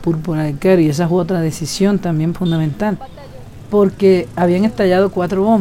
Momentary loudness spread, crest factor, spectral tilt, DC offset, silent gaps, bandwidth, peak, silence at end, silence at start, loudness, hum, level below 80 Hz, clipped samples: 7 LU; 12 dB; -7 dB/octave; under 0.1%; none; 16 kHz; -2 dBFS; 0 s; 0 s; -15 LUFS; none; -40 dBFS; under 0.1%